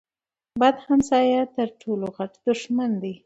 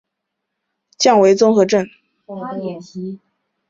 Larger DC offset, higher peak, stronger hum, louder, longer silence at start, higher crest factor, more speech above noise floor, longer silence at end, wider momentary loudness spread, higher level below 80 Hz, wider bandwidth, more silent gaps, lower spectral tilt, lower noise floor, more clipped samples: neither; second, -6 dBFS vs -2 dBFS; neither; second, -23 LUFS vs -14 LUFS; second, 0.55 s vs 1 s; about the same, 18 dB vs 16 dB; first, over 68 dB vs 63 dB; second, 0.1 s vs 0.55 s; second, 10 LU vs 19 LU; about the same, -60 dBFS vs -64 dBFS; about the same, 8 kHz vs 7.8 kHz; neither; about the same, -5.5 dB/octave vs -4.5 dB/octave; first, under -90 dBFS vs -78 dBFS; neither